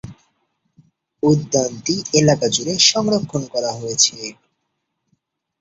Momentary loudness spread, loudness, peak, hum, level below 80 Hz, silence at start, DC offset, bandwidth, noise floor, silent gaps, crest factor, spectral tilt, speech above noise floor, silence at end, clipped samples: 10 LU; -17 LUFS; 0 dBFS; none; -54 dBFS; 0.05 s; under 0.1%; 8.4 kHz; -74 dBFS; none; 20 dB; -3.5 dB/octave; 56 dB; 1.3 s; under 0.1%